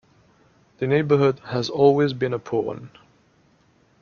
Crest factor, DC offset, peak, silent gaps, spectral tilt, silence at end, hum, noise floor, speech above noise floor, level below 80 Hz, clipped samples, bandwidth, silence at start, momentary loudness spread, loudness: 20 dB; under 0.1%; -4 dBFS; none; -7 dB/octave; 1.15 s; none; -60 dBFS; 39 dB; -62 dBFS; under 0.1%; 7 kHz; 0.8 s; 12 LU; -21 LUFS